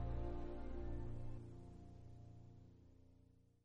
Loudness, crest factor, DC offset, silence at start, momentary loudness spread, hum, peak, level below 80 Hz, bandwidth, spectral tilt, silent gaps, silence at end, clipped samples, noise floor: -53 LUFS; 14 dB; under 0.1%; 0 s; 18 LU; none; -34 dBFS; -52 dBFS; 5.2 kHz; -9 dB/octave; none; 0.2 s; under 0.1%; -70 dBFS